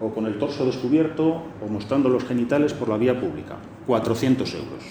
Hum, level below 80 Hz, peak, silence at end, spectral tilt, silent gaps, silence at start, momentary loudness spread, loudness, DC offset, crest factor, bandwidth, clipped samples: none; -56 dBFS; -6 dBFS; 0 s; -7 dB/octave; none; 0 s; 10 LU; -23 LUFS; under 0.1%; 16 dB; over 20 kHz; under 0.1%